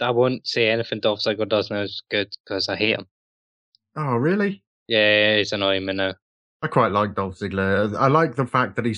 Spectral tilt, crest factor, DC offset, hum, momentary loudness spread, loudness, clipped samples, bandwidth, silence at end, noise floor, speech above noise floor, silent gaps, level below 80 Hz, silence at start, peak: -6 dB/octave; 18 dB; under 0.1%; none; 9 LU; -21 LUFS; under 0.1%; 10.5 kHz; 0 s; under -90 dBFS; over 69 dB; 2.40-2.44 s, 3.11-3.72 s, 4.67-4.86 s, 6.22-6.60 s; -62 dBFS; 0 s; -4 dBFS